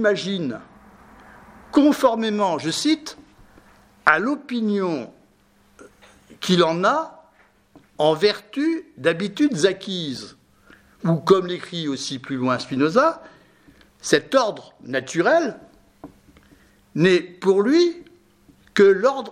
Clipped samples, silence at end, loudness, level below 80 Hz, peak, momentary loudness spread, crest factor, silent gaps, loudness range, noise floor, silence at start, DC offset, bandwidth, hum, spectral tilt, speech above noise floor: under 0.1%; 0 s; -21 LUFS; -62 dBFS; 0 dBFS; 13 LU; 22 dB; none; 3 LU; -58 dBFS; 0 s; under 0.1%; 15.5 kHz; none; -5 dB/octave; 38 dB